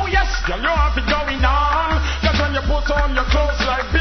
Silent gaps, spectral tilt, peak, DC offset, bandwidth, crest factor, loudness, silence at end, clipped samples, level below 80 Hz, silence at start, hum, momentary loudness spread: none; -5 dB/octave; -2 dBFS; under 0.1%; 6.4 kHz; 16 dB; -18 LUFS; 0 s; under 0.1%; -20 dBFS; 0 s; none; 3 LU